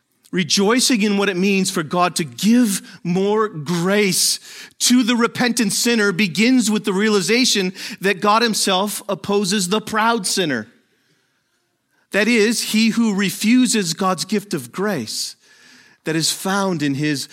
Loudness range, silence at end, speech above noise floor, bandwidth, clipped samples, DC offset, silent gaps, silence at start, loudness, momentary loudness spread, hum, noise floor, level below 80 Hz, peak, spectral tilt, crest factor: 4 LU; 0.05 s; 50 dB; 16.5 kHz; under 0.1%; under 0.1%; none; 0.35 s; -18 LUFS; 8 LU; none; -68 dBFS; -68 dBFS; -2 dBFS; -3.5 dB/octave; 16 dB